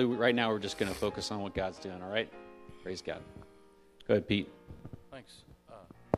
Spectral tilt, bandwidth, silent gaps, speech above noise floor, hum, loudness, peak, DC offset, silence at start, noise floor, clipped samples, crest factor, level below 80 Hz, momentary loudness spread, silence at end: -5 dB/octave; 14 kHz; none; 26 dB; none; -34 LUFS; -10 dBFS; under 0.1%; 0 s; -60 dBFS; under 0.1%; 24 dB; -58 dBFS; 24 LU; 0 s